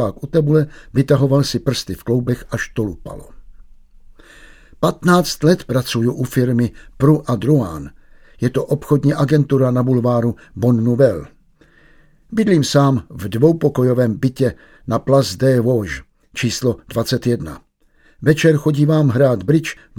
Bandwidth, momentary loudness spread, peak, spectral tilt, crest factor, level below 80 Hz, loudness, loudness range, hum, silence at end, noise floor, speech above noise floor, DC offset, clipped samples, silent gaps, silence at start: 17 kHz; 9 LU; 0 dBFS; -6.5 dB/octave; 16 dB; -42 dBFS; -17 LUFS; 4 LU; none; 0.25 s; -54 dBFS; 38 dB; under 0.1%; under 0.1%; none; 0 s